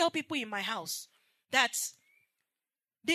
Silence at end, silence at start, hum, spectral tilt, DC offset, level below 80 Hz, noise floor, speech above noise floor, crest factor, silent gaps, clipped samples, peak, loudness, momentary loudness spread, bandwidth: 0 s; 0 s; none; -1 dB/octave; under 0.1%; under -90 dBFS; under -90 dBFS; over 57 dB; 24 dB; none; under 0.1%; -10 dBFS; -32 LUFS; 11 LU; 13.5 kHz